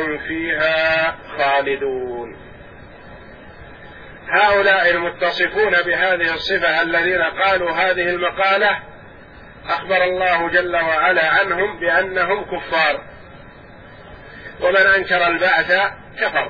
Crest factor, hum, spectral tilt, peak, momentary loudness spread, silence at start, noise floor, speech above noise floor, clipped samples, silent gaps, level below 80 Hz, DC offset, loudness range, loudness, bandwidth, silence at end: 16 dB; none; -5.5 dB/octave; -2 dBFS; 9 LU; 0 s; -40 dBFS; 23 dB; under 0.1%; none; -48 dBFS; 0.1%; 5 LU; -17 LUFS; 5.4 kHz; 0 s